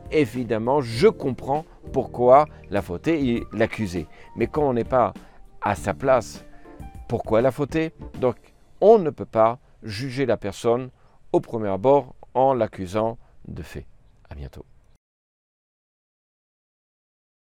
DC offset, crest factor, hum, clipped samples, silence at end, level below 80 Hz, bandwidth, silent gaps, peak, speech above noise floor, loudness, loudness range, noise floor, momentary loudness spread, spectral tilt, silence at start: under 0.1%; 22 dB; none; under 0.1%; 3 s; -48 dBFS; 15 kHz; none; -2 dBFS; 19 dB; -22 LUFS; 6 LU; -40 dBFS; 21 LU; -7 dB/octave; 0 s